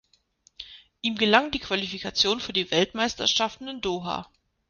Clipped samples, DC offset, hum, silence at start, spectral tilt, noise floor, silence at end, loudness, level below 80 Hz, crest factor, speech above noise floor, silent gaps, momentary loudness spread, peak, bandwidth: under 0.1%; under 0.1%; none; 0.6 s; -3 dB/octave; -64 dBFS; 0.45 s; -25 LUFS; -56 dBFS; 24 dB; 38 dB; none; 15 LU; -2 dBFS; 10 kHz